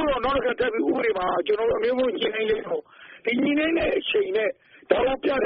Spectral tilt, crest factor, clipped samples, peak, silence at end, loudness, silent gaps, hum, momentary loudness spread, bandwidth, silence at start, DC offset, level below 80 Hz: -2 dB/octave; 18 dB; under 0.1%; -6 dBFS; 0 s; -24 LUFS; none; none; 5 LU; 5.4 kHz; 0 s; under 0.1%; -48 dBFS